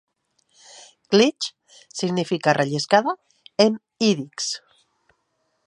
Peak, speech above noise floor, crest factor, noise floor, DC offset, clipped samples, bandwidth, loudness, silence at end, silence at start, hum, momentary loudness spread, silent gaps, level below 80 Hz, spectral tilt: -2 dBFS; 51 dB; 22 dB; -72 dBFS; under 0.1%; under 0.1%; 11 kHz; -22 LUFS; 1.1 s; 1.1 s; none; 13 LU; none; -72 dBFS; -4.5 dB/octave